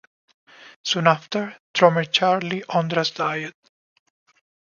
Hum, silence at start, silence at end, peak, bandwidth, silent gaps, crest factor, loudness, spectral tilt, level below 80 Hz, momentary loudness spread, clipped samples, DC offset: none; 0.65 s; 1.15 s; 0 dBFS; 7.2 kHz; 0.76-0.84 s, 1.59-1.74 s; 22 dB; -21 LUFS; -4.5 dB/octave; -72 dBFS; 11 LU; under 0.1%; under 0.1%